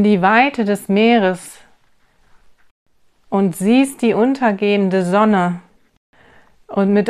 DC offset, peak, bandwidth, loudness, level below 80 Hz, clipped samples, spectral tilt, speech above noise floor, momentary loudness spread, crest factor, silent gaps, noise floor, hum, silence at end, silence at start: under 0.1%; 0 dBFS; 14.5 kHz; -15 LUFS; -60 dBFS; under 0.1%; -6 dB/octave; 40 dB; 10 LU; 16 dB; 2.71-2.86 s, 5.97-6.13 s; -55 dBFS; none; 0 s; 0 s